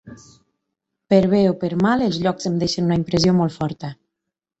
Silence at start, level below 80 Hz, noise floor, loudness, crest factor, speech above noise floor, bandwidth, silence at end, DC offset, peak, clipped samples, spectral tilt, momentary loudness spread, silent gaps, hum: 0.05 s; -50 dBFS; -83 dBFS; -19 LUFS; 18 dB; 64 dB; 8.2 kHz; 0.65 s; under 0.1%; -2 dBFS; under 0.1%; -6.5 dB/octave; 10 LU; none; none